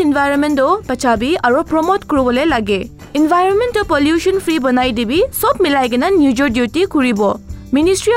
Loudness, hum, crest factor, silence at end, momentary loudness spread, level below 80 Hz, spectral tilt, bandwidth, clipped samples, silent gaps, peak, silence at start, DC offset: -14 LUFS; none; 10 dB; 0 s; 4 LU; -36 dBFS; -4.5 dB/octave; 16 kHz; under 0.1%; none; -2 dBFS; 0 s; under 0.1%